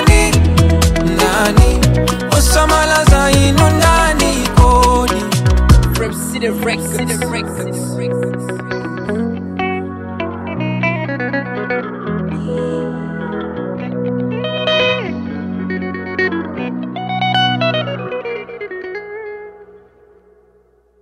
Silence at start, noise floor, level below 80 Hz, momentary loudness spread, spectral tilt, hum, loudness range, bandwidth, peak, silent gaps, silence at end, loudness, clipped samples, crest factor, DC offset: 0 s; -53 dBFS; -20 dBFS; 13 LU; -5 dB/octave; none; 9 LU; 16 kHz; 0 dBFS; none; 1.25 s; -15 LUFS; under 0.1%; 14 dB; under 0.1%